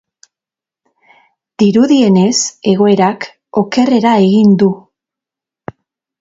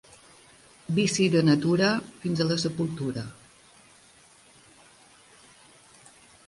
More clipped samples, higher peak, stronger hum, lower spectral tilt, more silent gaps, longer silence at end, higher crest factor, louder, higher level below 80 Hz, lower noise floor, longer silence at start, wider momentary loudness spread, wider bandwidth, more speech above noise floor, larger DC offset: neither; first, 0 dBFS vs -10 dBFS; neither; about the same, -5.5 dB/octave vs -5.5 dB/octave; neither; second, 1.45 s vs 3.15 s; second, 12 dB vs 20 dB; first, -11 LUFS vs -25 LUFS; first, -56 dBFS vs -62 dBFS; first, -88 dBFS vs -56 dBFS; first, 1.6 s vs 0.9 s; first, 20 LU vs 12 LU; second, 7.8 kHz vs 11.5 kHz; first, 78 dB vs 31 dB; neither